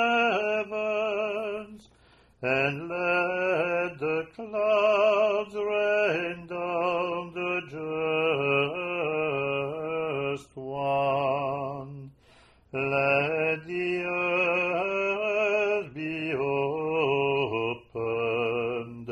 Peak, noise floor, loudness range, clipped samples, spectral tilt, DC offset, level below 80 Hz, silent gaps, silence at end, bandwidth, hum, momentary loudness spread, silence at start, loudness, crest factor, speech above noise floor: -12 dBFS; -59 dBFS; 3 LU; under 0.1%; -6 dB/octave; under 0.1%; -64 dBFS; none; 0 s; 10.5 kHz; none; 9 LU; 0 s; -27 LUFS; 16 dB; 33 dB